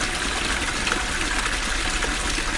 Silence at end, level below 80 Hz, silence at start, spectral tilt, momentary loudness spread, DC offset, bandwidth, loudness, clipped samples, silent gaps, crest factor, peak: 0 s; -30 dBFS; 0 s; -2 dB/octave; 1 LU; under 0.1%; 11.5 kHz; -23 LUFS; under 0.1%; none; 20 dB; -4 dBFS